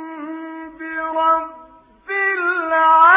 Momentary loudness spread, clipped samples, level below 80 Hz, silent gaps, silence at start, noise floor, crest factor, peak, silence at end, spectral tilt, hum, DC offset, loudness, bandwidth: 17 LU; under 0.1%; -60 dBFS; none; 0 s; -46 dBFS; 16 dB; -2 dBFS; 0 s; -5 dB/octave; none; under 0.1%; -17 LUFS; 3.9 kHz